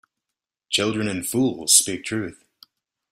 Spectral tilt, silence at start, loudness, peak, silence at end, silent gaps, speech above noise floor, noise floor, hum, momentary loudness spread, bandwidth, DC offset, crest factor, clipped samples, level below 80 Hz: -2.5 dB/octave; 0.7 s; -20 LUFS; 0 dBFS; 0.8 s; none; 64 dB; -86 dBFS; none; 13 LU; 16 kHz; under 0.1%; 24 dB; under 0.1%; -62 dBFS